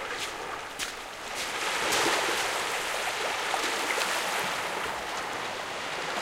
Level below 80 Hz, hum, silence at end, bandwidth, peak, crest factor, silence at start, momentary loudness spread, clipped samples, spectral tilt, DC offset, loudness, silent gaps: -60 dBFS; none; 0 s; 16.5 kHz; -12 dBFS; 18 dB; 0 s; 9 LU; under 0.1%; -0.5 dB/octave; under 0.1%; -29 LUFS; none